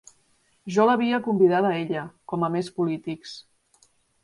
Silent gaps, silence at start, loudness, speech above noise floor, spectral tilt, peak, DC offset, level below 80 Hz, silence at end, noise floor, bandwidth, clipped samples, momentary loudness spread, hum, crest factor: none; 0.65 s; -24 LUFS; 42 dB; -6.5 dB/octave; -8 dBFS; under 0.1%; -68 dBFS; 0.8 s; -65 dBFS; 11.5 kHz; under 0.1%; 17 LU; none; 18 dB